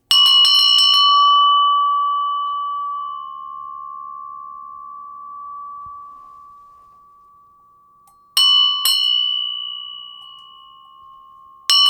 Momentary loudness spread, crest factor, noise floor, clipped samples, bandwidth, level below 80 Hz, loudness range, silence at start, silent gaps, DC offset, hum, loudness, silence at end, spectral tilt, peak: 25 LU; 16 dB; -52 dBFS; under 0.1%; 19.5 kHz; -70 dBFS; 22 LU; 0.1 s; none; under 0.1%; none; -13 LUFS; 0 s; 4 dB/octave; -2 dBFS